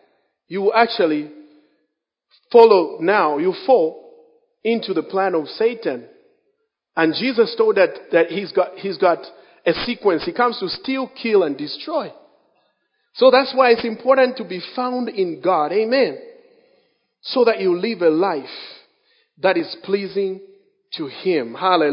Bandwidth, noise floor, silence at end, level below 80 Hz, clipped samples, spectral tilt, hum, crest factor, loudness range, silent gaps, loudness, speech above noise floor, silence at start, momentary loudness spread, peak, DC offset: 5.4 kHz; -74 dBFS; 0 s; -64 dBFS; under 0.1%; -8 dB/octave; none; 20 dB; 5 LU; none; -19 LUFS; 56 dB; 0.5 s; 12 LU; 0 dBFS; under 0.1%